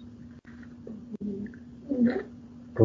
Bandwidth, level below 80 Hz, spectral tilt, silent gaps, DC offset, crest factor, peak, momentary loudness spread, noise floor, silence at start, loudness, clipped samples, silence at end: 5.4 kHz; -60 dBFS; -10 dB/octave; none; under 0.1%; 26 dB; -6 dBFS; 21 LU; -47 dBFS; 0 s; -32 LUFS; under 0.1%; 0 s